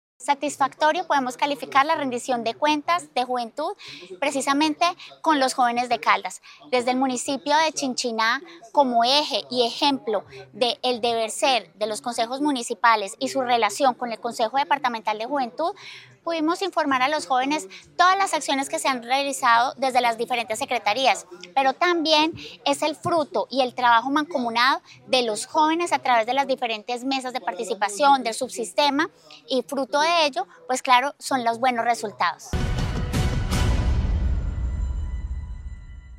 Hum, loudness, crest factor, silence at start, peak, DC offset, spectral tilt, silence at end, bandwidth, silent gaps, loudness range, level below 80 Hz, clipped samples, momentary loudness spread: none; -23 LUFS; 22 dB; 0.2 s; -2 dBFS; under 0.1%; -3.5 dB/octave; 0 s; 16 kHz; none; 3 LU; -36 dBFS; under 0.1%; 9 LU